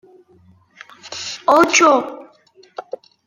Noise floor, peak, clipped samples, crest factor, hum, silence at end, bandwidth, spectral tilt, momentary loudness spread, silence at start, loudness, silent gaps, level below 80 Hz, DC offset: -52 dBFS; 0 dBFS; under 0.1%; 18 dB; none; 0.45 s; 16.5 kHz; -1.5 dB/octave; 25 LU; 1.05 s; -14 LUFS; none; -64 dBFS; under 0.1%